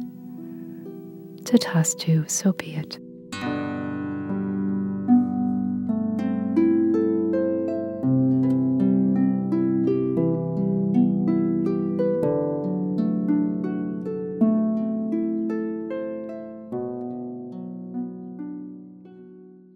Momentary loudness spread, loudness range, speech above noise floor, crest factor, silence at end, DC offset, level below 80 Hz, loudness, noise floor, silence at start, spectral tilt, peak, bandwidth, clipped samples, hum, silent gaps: 16 LU; 8 LU; 24 dB; 20 dB; 0.2 s; under 0.1%; -66 dBFS; -24 LUFS; -46 dBFS; 0 s; -6.5 dB/octave; -4 dBFS; 16 kHz; under 0.1%; none; none